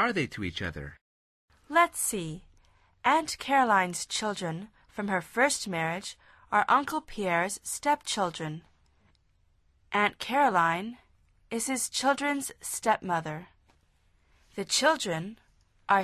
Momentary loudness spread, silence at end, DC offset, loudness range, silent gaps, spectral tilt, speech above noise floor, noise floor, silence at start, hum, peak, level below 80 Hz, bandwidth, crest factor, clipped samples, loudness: 16 LU; 0 s; under 0.1%; 3 LU; 1.01-1.48 s; -3 dB/octave; 39 dB; -67 dBFS; 0 s; none; -10 dBFS; -60 dBFS; 13.5 kHz; 20 dB; under 0.1%; -28 LUFS